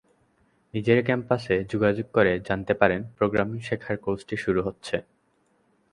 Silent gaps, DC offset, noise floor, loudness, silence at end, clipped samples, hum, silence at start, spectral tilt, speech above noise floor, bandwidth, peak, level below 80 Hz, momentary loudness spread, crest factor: none; under 0.1%; -67 dBFS; -25 LUFS; 0.9 s; under 0.1%; none; 0.75 s; -7 dB/octave; 43 dB; 11.5 kHz; -2 dBFS; -52 dBFS; 8 LU; 24 dB